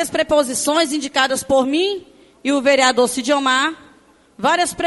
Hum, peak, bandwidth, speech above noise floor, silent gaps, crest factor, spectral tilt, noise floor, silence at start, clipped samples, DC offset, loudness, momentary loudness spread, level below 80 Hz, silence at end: none; -2 dBFS; 12 kHz; 34 dB; none; 16 dB; -2 dB/octave; -51 dBFS; 0 s; under 0.1%; under 0.1%; -17 LUFS; 8 LU; -54 dBFS; 0 s